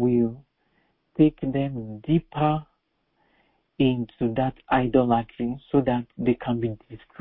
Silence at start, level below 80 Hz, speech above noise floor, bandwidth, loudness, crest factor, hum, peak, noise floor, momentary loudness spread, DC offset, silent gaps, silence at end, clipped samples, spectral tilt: 0 s; -50 dBFS; 48 dB; 4 kHz; -25 LUFS; 20 dB; none; -6 dBFS; -72 dBFS; 10 LU; under 0.1%; none; 0.25 s; under 0.1%; -12 dB/octave